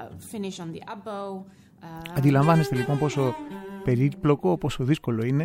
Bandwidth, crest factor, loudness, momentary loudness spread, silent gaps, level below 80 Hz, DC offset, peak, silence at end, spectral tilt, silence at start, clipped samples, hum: 16 kHz; 18 dB; -25 LUFS; 17 LU; none; -52 dBFS; under 0.1%; -6 dBFS; 0 s; -7.5 dB/octave; 0 s; under 0.1%; none